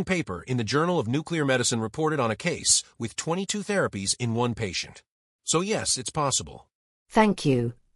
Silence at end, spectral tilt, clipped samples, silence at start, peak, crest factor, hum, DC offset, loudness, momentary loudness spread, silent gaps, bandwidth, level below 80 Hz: 0.2 s; -3.5 dB/octave; under 0.1%; 0 s; -6 dBFS; 20 dB; none; under 0.1%; -25 LUFS; 8 LU; 5.10-5.39 s, 6.75-7.06 s; 13.5 kHz; -56 dBFS